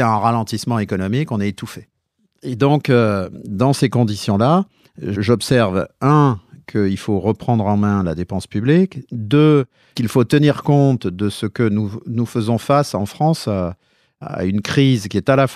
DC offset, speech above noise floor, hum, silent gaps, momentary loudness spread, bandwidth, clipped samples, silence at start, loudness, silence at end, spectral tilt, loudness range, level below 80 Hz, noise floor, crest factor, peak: under 0.1%; 49 dB; none; none; 11 LU; 14.5 kHz; under 0.1%; 0 s; -17 LUFS; 0 s; -7 dB/octave; 3 LU; -50 dBFS; -66 dBFS; 16 dB; -2 dBFS